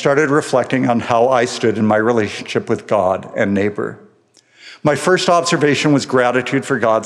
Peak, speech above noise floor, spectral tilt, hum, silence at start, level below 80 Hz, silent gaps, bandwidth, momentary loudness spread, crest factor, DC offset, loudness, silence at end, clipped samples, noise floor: 0 dBFS; 38 dB; -5 dB/octave; none; 0 s; -64 dBFS; none; 12.5 kHz; 7 LU; 16 dB; under 0.1%; -16 LUFS; 0 s; under 0.1%; -53 dBFS